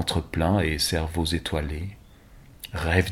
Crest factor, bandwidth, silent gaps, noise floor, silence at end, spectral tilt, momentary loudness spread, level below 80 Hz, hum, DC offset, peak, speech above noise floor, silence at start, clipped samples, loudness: 22 dB; 16 kHz; none; -50 dBFS; 0 s; -5 dB/octave; 13 LU; -36 dBFS; none; under 0.1%; -4 dBFS; 25 dB; 0 s; under 0.1%; -26 LUFS